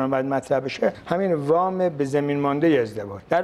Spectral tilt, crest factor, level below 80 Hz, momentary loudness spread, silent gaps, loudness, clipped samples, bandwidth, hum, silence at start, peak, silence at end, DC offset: -7 dB/octave; 18 dB; -60 dBFS; 5 LU; none; -23 LUFS; under 0.1%; 13 kHz; none; 0 s; -4 dBFS; 0 s; under 0.1%